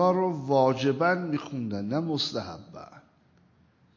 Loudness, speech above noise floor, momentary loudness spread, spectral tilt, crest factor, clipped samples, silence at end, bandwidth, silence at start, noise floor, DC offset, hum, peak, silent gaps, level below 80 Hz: -27 LUFS; 36 dB; 18 LU; -6.5 dB/octave; 18 dB; under 0.1%; 0.95 s; 7.4 kHz; 0 s; -62 dBFS; under 0.1%; none; -10 dBFS; none; -64 dBFS